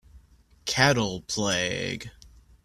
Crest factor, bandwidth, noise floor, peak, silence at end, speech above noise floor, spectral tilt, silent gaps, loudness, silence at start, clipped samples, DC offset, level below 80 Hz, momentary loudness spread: 26 dB; 14.5 kHz; -57 dBFS; -2 dBFS; 0.4 s; 31 dB; -3.5 dB/octave; none; -25 LUFS; 0.15 s; under 0.1%; under 0.1%; -52 dBFS; 15 LU